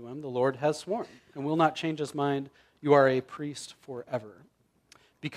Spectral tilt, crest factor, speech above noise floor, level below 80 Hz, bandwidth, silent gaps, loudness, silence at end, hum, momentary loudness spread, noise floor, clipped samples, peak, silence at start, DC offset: -6 dB/octave; 22 dB; 34 dB; -74 dBFS; 13 kHz; none; -29 LUFS; 0 s; none; 18 LU; -62 dBFS; under 0.1%; -8 dBFS; 0 s; under 0.1%